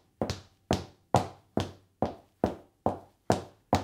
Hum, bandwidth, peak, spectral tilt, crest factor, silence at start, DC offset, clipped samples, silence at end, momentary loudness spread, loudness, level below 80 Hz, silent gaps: none; 17 kHz; -6 dBFS; -6 dB/octave; 26 dB; 0.2 s; under 0.1%; under 0.1%; 0 s; 6 LU; -33 LUFS; -54 dBFS; none